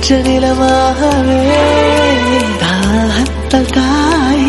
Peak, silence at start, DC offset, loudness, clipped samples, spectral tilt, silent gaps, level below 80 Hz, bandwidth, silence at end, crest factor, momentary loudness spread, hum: 0 dBFS; 0 s; under 0.1%; -11 LUFS; 0.1%; -5 dB/octave; none; -24 dBFS; 12 kHz; 0 s; 10 dB; 4 LU; none